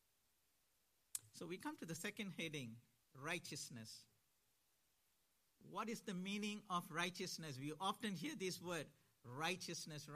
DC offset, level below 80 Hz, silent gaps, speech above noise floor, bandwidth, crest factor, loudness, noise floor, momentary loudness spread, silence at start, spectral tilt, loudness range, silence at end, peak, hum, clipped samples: under 0.1%; -88 dBFS; none; 35 dB; 15 kHz; 26 dB; -48 LUFS; -83 dBFS; 11 LU; 1.15 s; -3.5 dB/octave; 6 LU; 0 s; -24 dBFS; none; under 0.1%